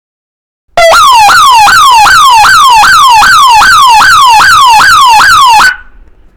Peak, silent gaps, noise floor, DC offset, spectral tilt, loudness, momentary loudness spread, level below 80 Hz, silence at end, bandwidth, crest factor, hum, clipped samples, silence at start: 0 dBFS; none; -33 dBFS; 3%; 0.5 dB/octave; -1 LUFS; 2 LU; -32 dBFS; 0.6 s; over 20 kHz; 2 dB; none; 20%; 0.75 s